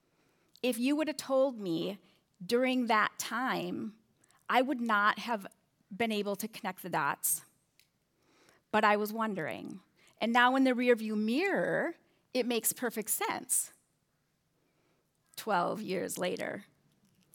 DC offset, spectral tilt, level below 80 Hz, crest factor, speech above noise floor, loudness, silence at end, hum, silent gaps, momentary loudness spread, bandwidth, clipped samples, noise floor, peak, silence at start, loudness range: under 0.1%; -3 dB/octave; -88 dBFS; 22 dB; 46 dB; -32 LUFS; 0.7 s; none; none; 13 LU; over 20 kHz; under 0.1%; -77 dBFS; -12 dBFS; 0.65 s; 6 LU